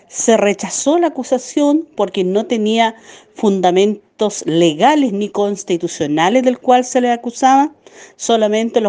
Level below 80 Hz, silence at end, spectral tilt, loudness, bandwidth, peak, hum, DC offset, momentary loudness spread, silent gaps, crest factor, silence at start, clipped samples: -62 dBFS; 0 s; -4 dB/octave; -15 LUFS; 10 kHz; 0 dBFS; none; under 0.1%; 7 LU; none; 14 dB; 0.15 s; under 0.1%